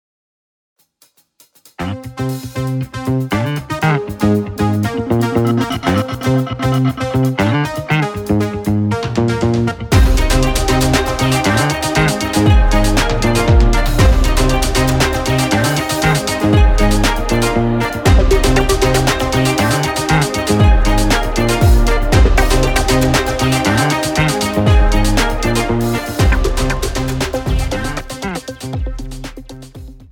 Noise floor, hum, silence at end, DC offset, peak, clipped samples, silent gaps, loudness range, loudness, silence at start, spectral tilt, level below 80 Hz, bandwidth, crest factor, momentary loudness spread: -55 dBFS; none; 0.1 s; under 0.1%; -2 dBFS; under 0.1%; none; 5 LU; -15 LUFS; 1.8 s; -5 dB/octave; -18 dBFS; 18 kHz; 12 dB; 9 LU